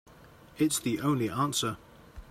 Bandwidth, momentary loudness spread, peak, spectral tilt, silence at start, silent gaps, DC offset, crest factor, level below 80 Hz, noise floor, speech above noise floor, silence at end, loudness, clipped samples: 16 kHz; 5 LU; -16 dBFS; -4.5 dB/octave; 0.1 s; none; under 0.1%; 16 dB; -58 dBFS; -54 dBFS; 25 dB; 0 s; -29 LUFS; under 0.1%